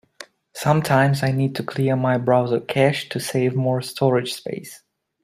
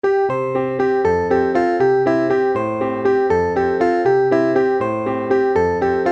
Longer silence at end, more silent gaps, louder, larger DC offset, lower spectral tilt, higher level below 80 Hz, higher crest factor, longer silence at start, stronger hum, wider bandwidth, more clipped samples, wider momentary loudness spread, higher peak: first, 0.45 s vs 0 s; neither; second, -21 LUFS vs -17 LUFS; neither; second, -6 dB/octave vs -7.5 dB/octave; second, -58 dBFS vs -48 dBFS; about the same, 18 dB vs 14 dB; first, 0.2 s vs 0.05 s; neither; first, 15.5 kHz vs 7.6 kHz; neither; first, 11 LU vs 4 LU; about the same, -2 dBFS vs -2 dBFS